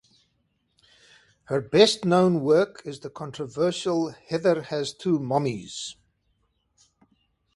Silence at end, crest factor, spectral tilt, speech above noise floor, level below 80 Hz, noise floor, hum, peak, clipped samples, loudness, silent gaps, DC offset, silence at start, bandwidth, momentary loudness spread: 1.65 s; 24 dB; -5.5 dB/octave; 48 dB; -64 dBFS; -72 dBFS; none; -2 dBFS; under 0.1%; -24 LUFS; none; under 0.1%; 1.5 s; 11.5 kHz; 17 LU